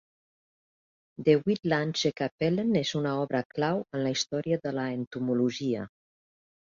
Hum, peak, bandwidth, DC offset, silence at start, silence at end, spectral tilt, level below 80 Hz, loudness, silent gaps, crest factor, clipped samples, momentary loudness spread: none; -10 dBFS; 7.6 kHz; under 0.1%; 1.2 s; 0.9 s; -5.5 dB/octave; -68 dBFS; -29 LUFS; 2.32-2.38 s, 3.45-3.50 s, 5.07-5.11 s; 20 dB; under 0.1%; 7 LU